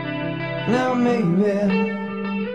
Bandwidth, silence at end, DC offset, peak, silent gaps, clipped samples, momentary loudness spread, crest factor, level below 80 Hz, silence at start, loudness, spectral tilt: 9.2 kHz; 0 s; 0.2%; -8 dBFS; none; under 0.1%; 7 LU; 14 dB; -56 dBFS; 0 s; -21 LUFS; -7.5 dB/octave